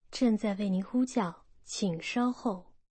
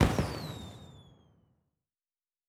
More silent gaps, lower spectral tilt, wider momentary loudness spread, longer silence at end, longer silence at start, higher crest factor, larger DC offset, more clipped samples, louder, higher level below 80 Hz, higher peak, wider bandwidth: neither; about the same, -5.5 dB/octave vs -6 dB/octave; second, 8 LU vs 23 LU; second, 0.3 s vs 1.45 s; about the same, 0.1 s vs 0 s; second, 14 dB vs 26 dB; neither; neither; first, -31 LUFS vs -35 LUFS; second, -62 dBFS vs -44 dBFS; second, -18 dBFS vs -10 dBFS; second, 8.8 kHz vs 17 kHz